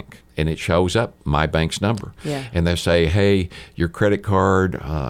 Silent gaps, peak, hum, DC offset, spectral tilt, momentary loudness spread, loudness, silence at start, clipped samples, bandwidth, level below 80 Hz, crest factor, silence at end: none; -4 dBFS; none; under 0.1%; -6 dB/octave; 9 LU; -20 LUFS; 0.35 s; under 0.1%; 15.5 kHz; -34 dBFS; 16 dB; 0 s